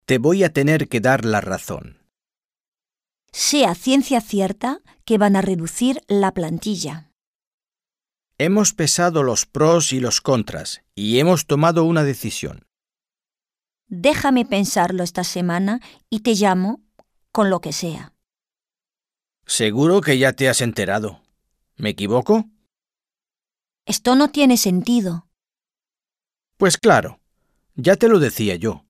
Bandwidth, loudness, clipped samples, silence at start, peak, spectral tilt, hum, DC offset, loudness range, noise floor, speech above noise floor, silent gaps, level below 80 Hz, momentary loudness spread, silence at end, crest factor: 15.5 kHz; -18 LUFS; under 0.1%; 0.1 s; -2 dBFS; -4.5 dB/octave; none; under 0.1%; 4 LU; under -90 dBFS; over 72 dB; 2.45-2.49 s, 2.68-2.72 s, 7.27-7.39 s, 7.47-7.58 s; -52 dBFS; 13 LU; 0.1 s; 18 dB